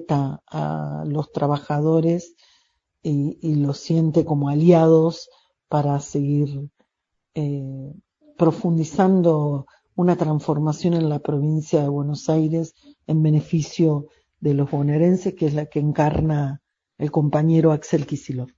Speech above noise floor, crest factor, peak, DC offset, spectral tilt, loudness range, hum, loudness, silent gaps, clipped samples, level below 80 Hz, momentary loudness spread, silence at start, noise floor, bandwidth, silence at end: 58 dB; 18 dB; -2 dBFS; under 0.1%; -8.5 dB/octave; 4 LU; none; -21 LUFS; none; under 0.1%; -50 dBFS; 11 LU; 0 s; -78 dBFS; 7.6 kHz; 0.1 s